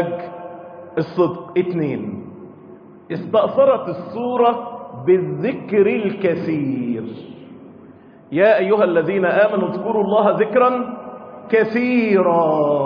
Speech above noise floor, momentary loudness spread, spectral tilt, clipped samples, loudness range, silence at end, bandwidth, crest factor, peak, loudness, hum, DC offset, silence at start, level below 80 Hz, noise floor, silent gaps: 26 dB; 17 LU; -9.5 dB/octave; under 0.1%; 4 LU; 0 s; 5.2 kHz; 14 dB; -4 dBFS; -18 LUFS; none; under 0.1%; 0 s; -64 dBFS; -43 dBFS; none